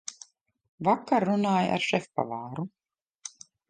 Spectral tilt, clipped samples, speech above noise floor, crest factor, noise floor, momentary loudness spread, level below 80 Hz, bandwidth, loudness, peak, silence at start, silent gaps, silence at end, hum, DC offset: -5 dB/octave; under 0.1%; 28 dB; 20 dB; -55 dBFS; 18 LU; -70 dBFS; 9.6 kHz; -27 LUFS; -10 dBFS; 0.1 s; 0.69-0.78 s, 3.02-3.06 s, 3.15-3.19 s; 0.4 s; none; under 0.1%